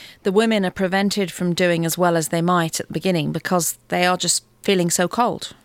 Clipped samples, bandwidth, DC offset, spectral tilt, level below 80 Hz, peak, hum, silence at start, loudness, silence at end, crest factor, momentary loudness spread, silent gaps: under 0.1%; 16.5 kHz; under 0.1%; -4 dB/octave; -56 dBFS; -4 dBFS; none; 0 s; -20 LUFS; 0.15 s; 16 dB; 4 LU; none